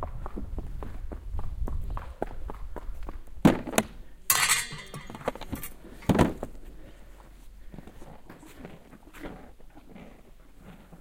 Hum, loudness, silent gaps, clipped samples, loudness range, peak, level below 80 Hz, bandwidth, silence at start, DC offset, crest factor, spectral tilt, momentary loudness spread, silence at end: none; -29 LUFS; none; under 0.1%; 21 LU; -4 dBFS; -40 dBFS; 17 kHz; 0 s; under 0.1%; 28 dB; -4 dB/octave; 26 LU; 0.05 s